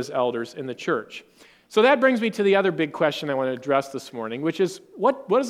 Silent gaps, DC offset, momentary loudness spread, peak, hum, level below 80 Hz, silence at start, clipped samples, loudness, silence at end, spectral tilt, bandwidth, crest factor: none; under 0.1%; 13 LU; -4 dBFS; none; -72 dBFS; 0 s; under 0.1%; -23 LUFS; 0 s; -5 dB/octave; 15 kHz; 18 dB